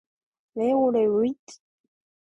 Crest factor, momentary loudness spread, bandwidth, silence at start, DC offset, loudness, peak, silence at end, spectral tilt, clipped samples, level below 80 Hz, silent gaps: 14 dB; 16 LU; 8.2 kHz; 0.55 s; under 0.1%; -23 LUFS; -12 dBFS; 0.8 s; -7 dB/octave; under 0.1%; -68 dBFS; 1.39-1.47 s